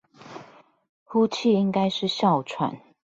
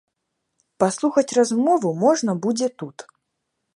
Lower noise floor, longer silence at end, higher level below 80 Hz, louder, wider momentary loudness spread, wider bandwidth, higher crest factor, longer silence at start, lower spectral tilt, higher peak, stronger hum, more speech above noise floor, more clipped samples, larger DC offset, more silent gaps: second, -51 dBFS vs -77 dBFS; second, 0.35 s vs 0.75 s; first, -68 dBFS vs -74 dBFS; second, -24 LUFS vs -20 LUFS; first, 22 LU vs 8 LU; second, 7.8 kHz vs 11.5 kHz; about the same, 16 dB vs 20 dB; second, 0.2 s vs 0.8 s; about the same, -6 dB/octave vs -5 dB/octave; second, -10 dBFS vs -2 dBFS; neither; second, 28 dB vs 57 dB; neither; neither; first, 0.89-1.06 s vs none